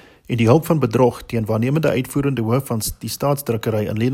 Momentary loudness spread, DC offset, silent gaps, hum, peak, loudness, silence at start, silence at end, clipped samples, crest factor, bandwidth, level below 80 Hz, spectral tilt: 8 LU; under 0.1%; none; none; -2 dBFS; -19 LUFS; 0.3 s; 0 s; under 0.1%; 18 dB; 16.5 kHz; -44 dBFS; -6.5 dB/octave